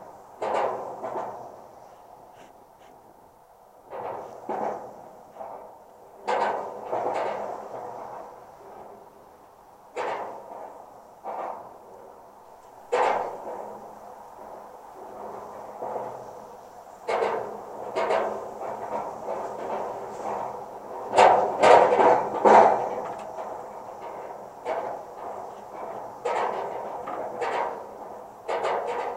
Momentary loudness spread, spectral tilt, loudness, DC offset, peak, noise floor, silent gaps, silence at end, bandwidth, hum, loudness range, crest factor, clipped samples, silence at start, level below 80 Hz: 25 LU; -4 dB/octave; -26 LUFS; under 0.1%; 0 dBFS; -54 dBFS; none; 0 s; 16 kHz; none; 19 LU; 28 dB; under 0.1%; 0 s; -68 dBFS